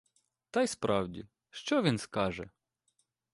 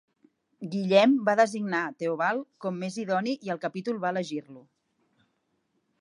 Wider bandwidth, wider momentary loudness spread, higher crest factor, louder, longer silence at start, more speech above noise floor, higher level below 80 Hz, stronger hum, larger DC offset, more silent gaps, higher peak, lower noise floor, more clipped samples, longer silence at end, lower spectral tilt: about the same, 11.5 kHz vs 11 kHz; first, 18 LU vs 14 LU; about the same, 20 dB vs 22 dB; second, -32 LUFS vs -27 LUFS; about the same, 0.55 s vs 0.6 s; about the same, 46 dB vs 48 dB; first, -62 dBFS vs -82 dBFS; neither; neither; neither; second, -14 dBFS vs -8 dBFS; about the same, -78 dBFS vs -75 dBFS; neither; second, 0.85 s vs 1.4 s; about the same, -5 dB/octave vs -5.5 dB/octave